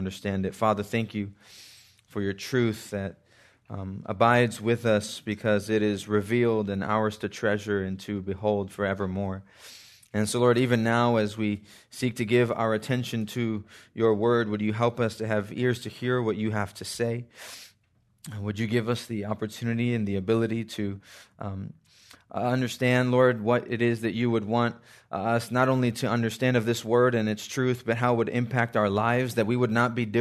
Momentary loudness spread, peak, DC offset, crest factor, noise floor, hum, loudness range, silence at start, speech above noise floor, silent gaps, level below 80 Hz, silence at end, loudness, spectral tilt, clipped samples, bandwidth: 14 LU; -6 dBFS; under 0.1%; 20 dB; -67 dBFS; none; 5 LU; 0 s; 41 dB; none; -66 dBFS; 0 s; -27 LUFS; -6 dB/octave; under 0.1%; 13.5 kHz